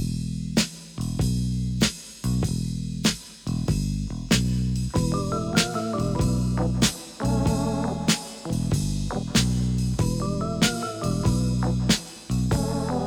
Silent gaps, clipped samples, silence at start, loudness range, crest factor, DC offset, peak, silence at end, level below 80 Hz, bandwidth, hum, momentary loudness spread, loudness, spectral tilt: none; under 0.1%; 0 s; 2 LU; 20 dB; under 0.1%; -4 dBFS; 0 s; -34 dBFS; 18.5 kHz; none; 6 LU; -25 LUFS; -5 dB/octave